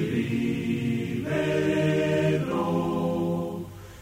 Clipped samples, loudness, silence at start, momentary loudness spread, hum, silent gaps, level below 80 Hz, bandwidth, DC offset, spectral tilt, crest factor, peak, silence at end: under 0.1%; -26 LUFS; 0 s; 6 LU; none; none; -54 dBFS; 16 kHz; under 0.1%; -7 dB/octave; 12 dB; -12 dBFS; 0 s